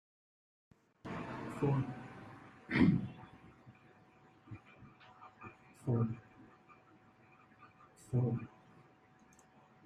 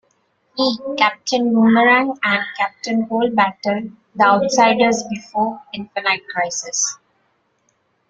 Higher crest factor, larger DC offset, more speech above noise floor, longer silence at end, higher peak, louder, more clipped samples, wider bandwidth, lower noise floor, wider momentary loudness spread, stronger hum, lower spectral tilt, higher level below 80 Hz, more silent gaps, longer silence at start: first, 24 dB vs 18 dB; neither; second, 32 dB vs 47 dB; first, 1.4 s vs 1.15 s; second, -16 dBFS vs 0 dBFS; second, -37 LUFS vs -17 LUFS; neither; first, 10.5 kHz vs 9.2 kHz; about the same, -65 dBFS vs -65 dBFS; first, 28 LU vs 10 LU; neither; first, -8.5 dB/octave vs -3 dB/octave; about the same, -66 dBFS vs -62 dBFS; neither; first, 1.05 s vs 0.55 s